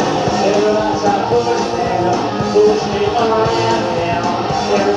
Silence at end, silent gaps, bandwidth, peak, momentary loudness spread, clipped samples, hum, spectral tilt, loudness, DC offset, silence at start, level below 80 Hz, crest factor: 0 s; none; 9.8 kHz; -2 dBFS; 4 LU; under 0.1%; none; -5 dB/octave; -15 LUFS; under 0.1%; 0 s; -42 dBFS; 12 dB